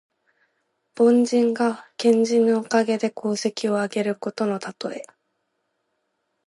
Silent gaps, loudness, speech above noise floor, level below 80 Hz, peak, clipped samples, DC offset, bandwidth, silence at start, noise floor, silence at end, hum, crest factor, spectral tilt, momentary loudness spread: none; -22 LUFS; 54 dB; -78 dBFS; -6 dBFS; under 0.1%; under 0.1%; 11.5 kHz; 0.95 s; -75 dBFS; 1.45 s; none; 16 dB; -5 dB/octave; 11 LU